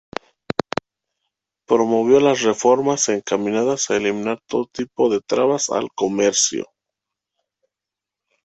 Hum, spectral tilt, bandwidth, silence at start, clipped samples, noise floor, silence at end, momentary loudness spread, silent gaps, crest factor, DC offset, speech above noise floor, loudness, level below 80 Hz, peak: none; -3.5 dB/octave; 8.4 kHz; 0.5 s; under 0.1%; -86 dBFS; 1.8 s; 12 LU; none; 18 dB; under 0.1%; 68 dB; -19 LUFS; -60 dBFS; -2 dBFS